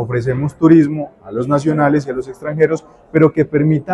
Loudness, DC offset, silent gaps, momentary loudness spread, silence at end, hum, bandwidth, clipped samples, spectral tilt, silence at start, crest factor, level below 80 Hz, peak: -15 LUFS; under 0.1%; none; 13 LU; 0 s; none; 9.8 kHz; under 0.1%; -9 dB/octave; 0 s; 14 dB; -48 dBFS; 0 dBFS